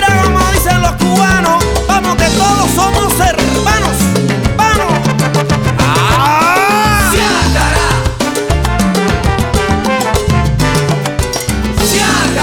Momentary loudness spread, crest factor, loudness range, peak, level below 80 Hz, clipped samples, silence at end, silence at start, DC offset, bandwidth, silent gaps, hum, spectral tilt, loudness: 4 LU; 10 dB; 2 LU; 0 dBFS; -20 dBFS; under 0.1%; 0 s; 0 s; 0.1%; 20 kHz; none; none; -4.5 dB/octave; -11 LUFS